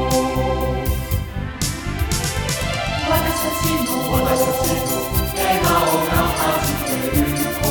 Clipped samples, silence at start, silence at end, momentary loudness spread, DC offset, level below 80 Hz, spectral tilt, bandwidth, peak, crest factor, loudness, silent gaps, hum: under 0.1%; 0 s; 0 s; 6 LU; under 0.1%; -30 dBFS; -4.5 dB/octave; over 20 kHz; -4 dBFS; 16 dB; -19 LUFS; none; none